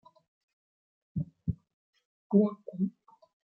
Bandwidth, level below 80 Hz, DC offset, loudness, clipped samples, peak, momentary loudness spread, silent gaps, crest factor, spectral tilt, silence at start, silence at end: 4 kHz; -58 dBFS; under 0.1%; -32 LUFS; under 0.1%; -12 dBFS; 13 LU; 1.74-1.93 s, 2.05-2.30 s; 22 dB; -13 dB/octave; 1.15 s; 0.7 s